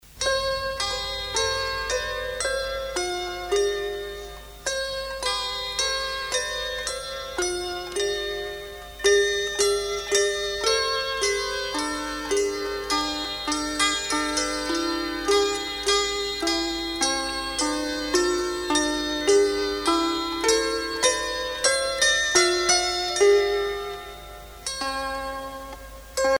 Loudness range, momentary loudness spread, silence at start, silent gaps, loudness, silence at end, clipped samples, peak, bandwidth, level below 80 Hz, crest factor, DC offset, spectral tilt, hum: 6 LU; 11 LU; 0.05 s; none; -24 LUFS; 0 s; under 0.1%; -6 dBFS; over 20 kHz; -46 dBFS; 20 dB; under 0.1%; -1.5 dB/octave; none